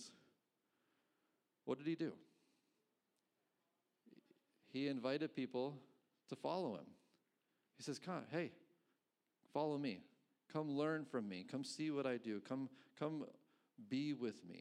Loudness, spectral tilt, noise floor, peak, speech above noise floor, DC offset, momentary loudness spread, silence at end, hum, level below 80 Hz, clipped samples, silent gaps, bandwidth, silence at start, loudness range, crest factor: -46 LUFS; -6 dB/octave; -89 dBFS; -28 dBFS; 44 dB; under 0.1%; 12 LU; 0 s; none; under -90 dBFS; under 0.1%; none; 11.5 kHz; 0 s; 7 LU; 20 dB